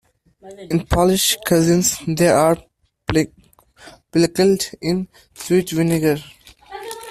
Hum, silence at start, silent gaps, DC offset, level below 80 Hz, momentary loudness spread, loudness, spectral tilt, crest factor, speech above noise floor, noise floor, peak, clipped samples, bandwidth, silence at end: none; 0.45 s; none; under 0.1%; -40 dBFS; 17 LU; -18 LUFS; -4.5 dB/octave; 16 dB; 19 dB; -37 dBFS; -2 dBFS; under 0.1%; 16 kHz; 0 s